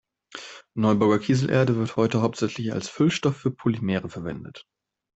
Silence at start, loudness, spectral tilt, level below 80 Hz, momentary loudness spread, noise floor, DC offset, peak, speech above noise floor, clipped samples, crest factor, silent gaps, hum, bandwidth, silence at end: 0.35 s; -24 LUFS; -6.5 dB/octave; -58 dBFS; 18 LU; -43 dBFS; under 0.1%; -6 dBFS; 20 dB; under 0.1%; 18 dB; none; none; 8.2 kHz; 0.55 s